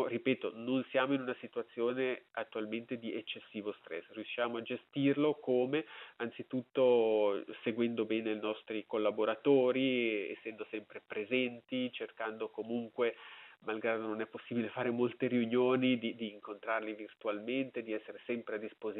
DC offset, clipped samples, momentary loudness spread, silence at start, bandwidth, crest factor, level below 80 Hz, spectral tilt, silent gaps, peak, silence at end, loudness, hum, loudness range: under 0.1%; under 0.1%; 13 LU; 0 s; 4.1 kHz; 18 dB; under -90 dBFS; -4 dB/octave; none; -16 dBFS; 0 s; -36 LUFS; none; 5 LU